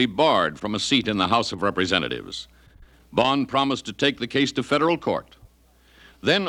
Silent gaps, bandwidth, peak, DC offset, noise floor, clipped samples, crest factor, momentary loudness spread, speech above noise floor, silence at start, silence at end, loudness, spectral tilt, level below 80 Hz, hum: none; 12 kHz; -4 dBFS; under 0.1%; -57 dBFS; under 0.1%; 18 dB; 8 LU; 34 dB; 0 s; 0 s; -23 LUFS; -4.5 dB/octave; -54 dBFS; none